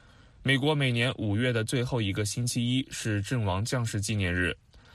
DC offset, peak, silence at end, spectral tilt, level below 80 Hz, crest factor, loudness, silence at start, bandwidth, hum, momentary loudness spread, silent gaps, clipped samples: under 0.1%; -10 dBFS; 0.15 s; -5 dB/octave; -54 dBFS; 18 dB; -28 LUFS; 0.4 s; 13.5 kHz; none; 5 LU; none; under 0.1%